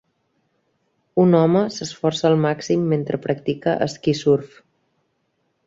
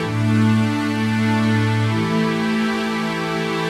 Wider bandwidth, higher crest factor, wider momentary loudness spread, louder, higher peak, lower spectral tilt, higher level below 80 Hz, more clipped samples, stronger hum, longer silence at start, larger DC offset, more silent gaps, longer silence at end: second, 7.8 kHz vs 13.5 kHz; first, 18 dB vs 12 dB; first, 8 LU vs 5 LU; about the same, -20 LUFS vs -19 LUFS; about the same, -4 dBFS vs -6 dBFS; about the same, -6.5 dB/octave vs -6.5 dB/octave; second, -60 dBFS vs -52 dBFS; neither; neither; first, 1.15 s vs 0 s; neither; neither; first, 1.2 s vs 0 s